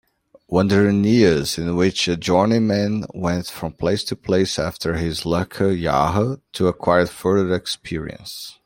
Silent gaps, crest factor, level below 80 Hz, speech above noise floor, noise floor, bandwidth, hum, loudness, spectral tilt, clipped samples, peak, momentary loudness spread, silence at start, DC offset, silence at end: none; 18 dB; -46 dBFS; 23 dB; -43 dBFS; 16.5 kHz; none; -20 LUFS; -5.5 dB/octave; under 0.1%; -2 dBFS; 9 LU; 0.5 s; under 0.1%; 0.15 s